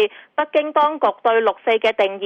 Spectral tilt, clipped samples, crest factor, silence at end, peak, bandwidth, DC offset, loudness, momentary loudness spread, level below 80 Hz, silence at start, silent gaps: -4.5 dB/octave; under 0.1%; 12 dB; 0 s; -6 dBFS; 7.6 kHz; under 0.1%; -18 LUFS; 4 LU; -70 dBFS; 0 s; none